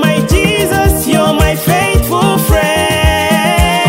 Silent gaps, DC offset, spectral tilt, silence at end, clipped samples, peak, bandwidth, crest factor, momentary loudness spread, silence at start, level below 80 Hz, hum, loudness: none; under 0.1%; -4.5 dB/octave; 0 s; under 0.1%; 0 dBFS; 16.5 kHz; 10 dB; 1 LU; 0 s; -18 dBFS; none; -11 LUFS